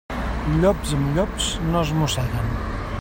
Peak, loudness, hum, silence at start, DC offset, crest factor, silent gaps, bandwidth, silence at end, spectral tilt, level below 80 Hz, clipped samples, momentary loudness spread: -6 dBFS; -23 LUFS; none; 0.1 s; under 0.1%; 16 dB; none; 16.5 kHz; 0 s; -5.5 dB/octave; -30 dBFS; under 0.1%; 8 LU